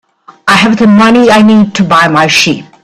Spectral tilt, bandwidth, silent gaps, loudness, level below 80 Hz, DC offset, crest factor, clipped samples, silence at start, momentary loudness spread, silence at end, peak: -4.5 dB/octave; 13.5 kHz; none; -6 LUFS; -42 dBFS; under 0.1%; 6 dB; 0.4%; 0.45 s; 4 LU; 0.2 s; 0 dBFS